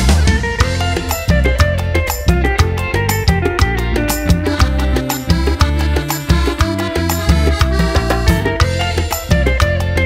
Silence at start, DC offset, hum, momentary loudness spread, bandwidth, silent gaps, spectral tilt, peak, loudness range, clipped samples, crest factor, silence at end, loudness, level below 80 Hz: 0 s; under 0.1%; none; 3 LU; 16.5 kHz; none; -5 dB/octave; 0 dBFS; 1 LU; under 0.1%; 14 dB; 0 s; -15 LUFS; -18 dBFS